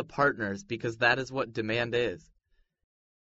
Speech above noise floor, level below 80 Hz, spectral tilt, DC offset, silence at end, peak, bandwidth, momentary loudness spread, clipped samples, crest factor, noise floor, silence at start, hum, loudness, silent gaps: 40 dB; -62 dBFS; -3 dB/octave; under 0.1%; 1.1 s; -10 dBFS; 7.6 kHz; 9 LU; under 0.1%; 20 dB; -70 dBFS; 0 s; none; -29 LUFS; none